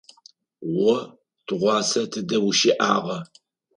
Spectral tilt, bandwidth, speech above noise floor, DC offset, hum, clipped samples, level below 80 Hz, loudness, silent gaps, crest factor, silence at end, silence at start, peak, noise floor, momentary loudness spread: -3.5 dB/octave; 11 kHz; 33 dB; under 0.1%; none; under 0.1%; -70 dBFS; -22 LUFS; none; 18 dB; 0.55 s; 0.6 s; -6 dBFS; -55 dBFS; 15 LU